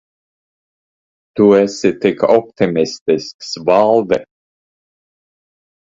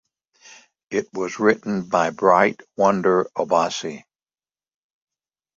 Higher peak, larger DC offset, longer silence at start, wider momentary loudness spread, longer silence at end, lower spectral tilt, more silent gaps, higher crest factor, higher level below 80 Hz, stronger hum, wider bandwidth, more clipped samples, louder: about the same, 0 dBFS vs 0 dBFS; neither; first, 1.35 s vs 0.9 s; about the same, 9 LU vs 11 LU; first, 1.75 s vs 1.55 s; about the same, -5.5 dB/octave vs -5 dB/octave; first, 3.01-3.06 s, 3.34-3.39 s vs none; second, 16 dB vs 22 dB; first, -56 dBFS vs -64 dBFS; neither; about the same, 7.8 kHz vs 7.8 kHz; neither; first, -14 LUFS vs -20 LUFS